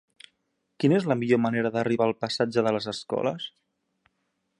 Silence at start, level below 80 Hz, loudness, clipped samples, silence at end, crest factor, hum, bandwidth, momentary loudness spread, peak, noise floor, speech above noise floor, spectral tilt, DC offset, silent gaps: 0.8 s; -68 dBFS; -26 LUFS; under 0.1%; 1.1 s; 18 dB; none; 11 kHz; 7 LU; -8 dBFS; -76 dBFS; 51 dB; -6.5 dB/octave; under 0.1%; none